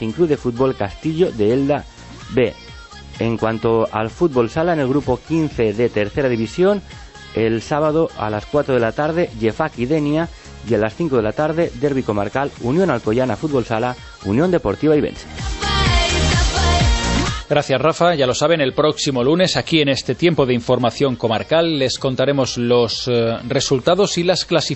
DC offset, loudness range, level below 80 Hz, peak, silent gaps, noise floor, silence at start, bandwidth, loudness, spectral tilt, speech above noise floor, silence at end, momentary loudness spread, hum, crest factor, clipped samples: under 0.1%; 3 LU; -32 dBFS; -2 dBFS; none; -37 dBFS; 0 s; 8.4 kHz; -18 LUFS; -5 dB/octave; 19 dB; 0 s; 7 LU; none; 16 dB; under 0.1%